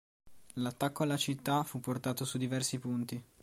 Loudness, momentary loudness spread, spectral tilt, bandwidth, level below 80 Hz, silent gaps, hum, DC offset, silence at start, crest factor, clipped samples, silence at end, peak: -35 LUFS; 6 LU; -4.5 dB/octave; 16.5 kHz; -70 dBFS; none; none; under 0.1%; 0.25 s; 18 dB; under 0.1%; 0.2 s; -18 dBFS